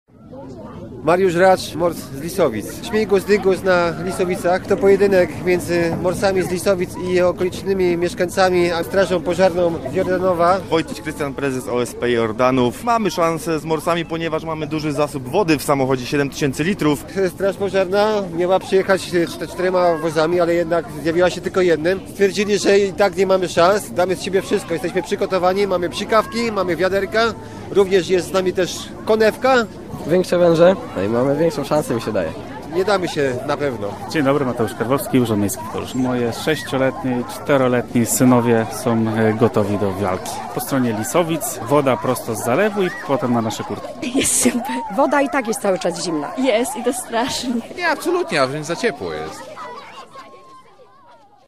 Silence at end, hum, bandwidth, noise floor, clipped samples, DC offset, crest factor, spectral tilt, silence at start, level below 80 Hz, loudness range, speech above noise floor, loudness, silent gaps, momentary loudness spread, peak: 0.85 s; none; 15.5 kHz; -48 dBFS; under 0.1%; 0.5%; 18 dB; -5 dB/octave; 0.2 s; -46 dBFS; 3 LU; 30 dB; -18 LUFS; none; 8 LU; 0 dBFS